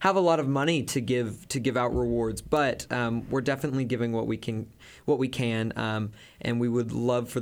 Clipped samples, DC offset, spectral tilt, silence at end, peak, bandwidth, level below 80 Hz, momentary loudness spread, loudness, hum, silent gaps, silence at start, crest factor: under 0.1%; under 0.1%; -6 dB/octave; 0 s; -10 dBFS; 19 kHz; -50 dBFS; 7 LU; -28 LUFS; none; none; 0 s; 18 dB